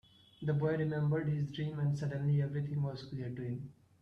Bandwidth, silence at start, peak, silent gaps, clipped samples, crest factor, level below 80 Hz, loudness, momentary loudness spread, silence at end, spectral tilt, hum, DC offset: 6.4 kHz; 0.4 s; -22 dBFS; none; under 0.1%; 14 dB; -66 dBFS; -36 LUFS; 9 LU; 0.3 s; -9 dB/octave; none; under 0.1%